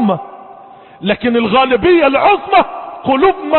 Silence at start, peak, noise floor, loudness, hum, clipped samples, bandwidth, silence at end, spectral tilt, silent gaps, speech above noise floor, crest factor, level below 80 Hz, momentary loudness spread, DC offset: 0 s; 0 dBFS; -37 dBFS; -12 LUFS; none; under 0.1%; 4.3 kHz; 0 s; -10 dB/octave; none; 26 dB; 12 dB; -44 dBFS; 12 LU; under 0.1%